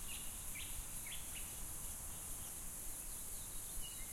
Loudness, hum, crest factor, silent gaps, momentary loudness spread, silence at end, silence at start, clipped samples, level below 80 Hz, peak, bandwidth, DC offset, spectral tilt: -46 LUFS; none; 16 dB; none; 1 LU; 0 s; 0 s; under 0.1%; -54 dBFS; -32 dBFS; 16.5 kHz; under 0.1%; -1.5 dB/octave